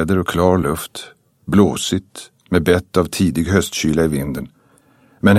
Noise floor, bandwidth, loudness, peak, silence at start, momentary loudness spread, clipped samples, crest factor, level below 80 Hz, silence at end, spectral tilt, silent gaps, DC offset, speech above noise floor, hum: -53 dBFS; 15.5 kHz; -17 LUFS; 0 dBFS; 0 s; 17 LU; under 0.1%; 16 dB; -38 dBFS; 0 s; -5.5 dB/octave; none; under 0.1%; 36 dB; none